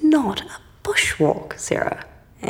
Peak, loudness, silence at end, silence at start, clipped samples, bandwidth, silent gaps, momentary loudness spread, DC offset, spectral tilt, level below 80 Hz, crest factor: -4 dBFS; -21 LUFS; 0 s; 0 s; under 0.1%; 16.5 kHz; none; 14 LU; under 0.1%; -4 dB/octave; -48 dBFS; 16 dB